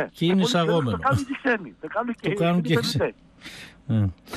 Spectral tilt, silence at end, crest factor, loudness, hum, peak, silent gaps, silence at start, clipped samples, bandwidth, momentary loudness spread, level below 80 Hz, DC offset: -6 dB/octave; 0 s; 14 dB; -24 LUFS; none; -10 dBFS; none; 0 s; under 0.1%; 14 kHz; 19 LU; -54 dBFS; under 0.1%